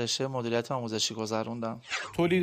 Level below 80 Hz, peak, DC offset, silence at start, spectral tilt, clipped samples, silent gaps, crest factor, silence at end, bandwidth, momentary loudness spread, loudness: -64 dBFS; -14 dBFS; under 0.1%; 0 s; -4 dB/octave; under 0.1%; none; 16 dB; 0 s; 15.5 kHz; 5 LU; -31 LUFS